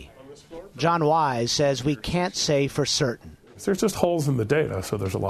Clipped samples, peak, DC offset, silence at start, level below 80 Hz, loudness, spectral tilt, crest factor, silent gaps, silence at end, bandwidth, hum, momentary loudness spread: under 0.1%; -4 dBFS; under 0.1%; 0 s; -48 dBFS; -24 LUFS; -4.5 dB/octave; 20 dB; none; 0 s; 13.5 kHz; none; 9 LU